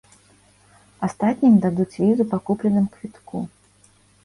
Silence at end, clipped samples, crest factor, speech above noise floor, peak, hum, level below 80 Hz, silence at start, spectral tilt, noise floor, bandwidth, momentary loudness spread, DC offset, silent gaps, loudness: 0.75 s; under 0.1%; 16 dB; 36 dB; -6 dBFS; 50 Hz at -35 dBFS; -58 dBFS; 1 s; -9 dB/octave; -56 dBFS; 11.5 kHz; 16 LU; under 0.1%; none; -21 LUFS